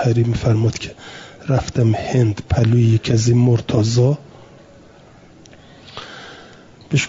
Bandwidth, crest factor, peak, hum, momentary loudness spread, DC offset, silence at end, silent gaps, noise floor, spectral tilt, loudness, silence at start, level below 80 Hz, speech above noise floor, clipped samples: 7.8 kHz; 14 dB; -4 dBFS; none; 20 LU; under 0.1%; 0 s; none; -45 dBFS; -6.5 dB/octave; -17 LUFS; 0 s; -42 dBFS; 29 dB; under 0.1%